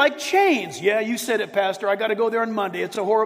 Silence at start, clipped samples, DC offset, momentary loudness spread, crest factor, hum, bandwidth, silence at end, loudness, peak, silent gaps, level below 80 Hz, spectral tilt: 0 s; under 0.1%; under 0.1%; 6 LU; 16 dB; none; 16 kHz; 0 s; -22 LUFS; -6 dBFS; none; -72 dBFS; -3.5 dB/octave